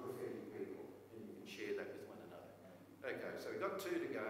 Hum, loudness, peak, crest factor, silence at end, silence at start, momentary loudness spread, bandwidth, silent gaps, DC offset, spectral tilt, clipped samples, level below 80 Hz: none; -48 LUFS; -28 dBFS; 18 dB; 0 s; 0 s; 14 LU; 16 kHz; none; under 0.1%; -5 dB/octave; under 0.1%; -84 dBFS